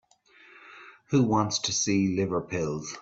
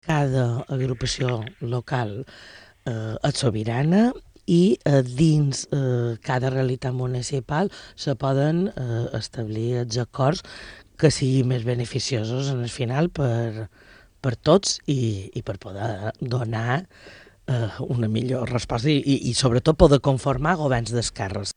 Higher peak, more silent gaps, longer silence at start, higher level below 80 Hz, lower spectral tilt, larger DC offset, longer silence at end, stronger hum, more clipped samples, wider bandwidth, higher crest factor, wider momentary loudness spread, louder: second, -10 dBFS vs 0 dBFS; neither; first, 0.55 s vs 0.05 s; second, -60 dBFS vs -42 dBFS; second, -4.5 dB/octave vs -6 dB/octave; neither; about the same, 0 s vs 0.05 s; neither; neither; second, 8 kHz vs 10.5 kHz; about the same, 18 dB vs 22 dB; second, 8 LU vs 11 LU; second, -26 LUFS vs -23 LUFS